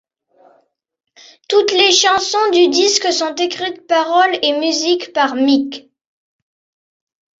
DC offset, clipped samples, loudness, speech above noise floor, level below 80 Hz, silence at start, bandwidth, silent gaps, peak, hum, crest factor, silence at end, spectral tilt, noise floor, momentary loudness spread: under 0.1%; under 0.1%; -14 LUFS; 46 dB; -62 dBFS; 1.5 s; 8 kHz; none; 0 dBFS; none; 16 dB; 1.6 s; -0.5 dB/octave; -60 dBFS; 8 LU